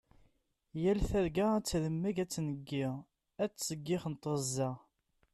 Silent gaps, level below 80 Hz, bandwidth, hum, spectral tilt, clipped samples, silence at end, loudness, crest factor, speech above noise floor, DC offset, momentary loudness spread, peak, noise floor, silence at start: none; -50 dBFS; 13.5 kHz; none; -5.5 dB/octave; under 0.1%; 0.55 s; -35 LUFS; 14 dB; 39 dB; under 0.1%; 8 LU; -22 dBFS; -73 dBFS; 0.75 s